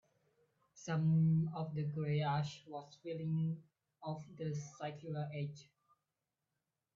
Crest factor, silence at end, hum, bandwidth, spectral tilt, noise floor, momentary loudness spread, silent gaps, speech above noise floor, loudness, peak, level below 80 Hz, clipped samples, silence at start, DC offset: 14 dB; 1.35 s; none; 7.4 kHz; -7.5 dB/octave; -90 dBFS; 16 LU; none; 52 dB; -39 LUFS; -26 dBFS; -78 dBFS; under 0.1%; 0.75 s; under 0.1%